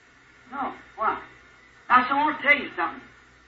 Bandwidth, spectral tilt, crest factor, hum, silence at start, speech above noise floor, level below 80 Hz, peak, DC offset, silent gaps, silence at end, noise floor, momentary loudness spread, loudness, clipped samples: 7.8 kHz; -4.5 dB/octave; 22 dB; none; 0.5 s; 28 dB; -62 dBFS; -6 dBFS; under 0.1%; none; 0.45 s; -54 dBFS; 15 LU; -24 LUFS; under 0.1%